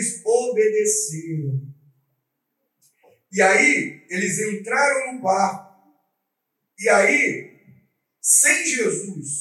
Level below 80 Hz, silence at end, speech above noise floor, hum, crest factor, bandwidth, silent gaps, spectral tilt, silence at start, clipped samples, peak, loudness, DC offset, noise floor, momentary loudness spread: -82 dBFS; 0 s; 58 dB; none; 20 dB; 14.5 kHz; none; -3 dB/octave; 0 s; under 0.1%; -2 dBFS; -19 LUFS; under 0.1%; -78 dBFS; 14 LU